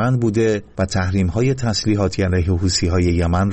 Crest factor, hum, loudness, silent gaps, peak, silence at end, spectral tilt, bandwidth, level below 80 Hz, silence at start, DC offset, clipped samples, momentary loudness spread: 12 dB; none; -18 LUFS; none; -6 dBFS; 0 s; -6 dB/octave; 8.6 kHz; -32 dBFS; 0 s; under 0.1%; under 0.1%; 3 LU